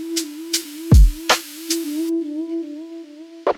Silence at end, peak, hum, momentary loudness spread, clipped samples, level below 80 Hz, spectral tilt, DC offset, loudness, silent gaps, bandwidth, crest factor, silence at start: 0 s; -2 dBFS; none; 19 LU; under 0.1%; -22 dBFS; -4.5 dB/octave; under 0.1%; -20 LUFS; none; 17.5 kHz; 18 dB; 0 s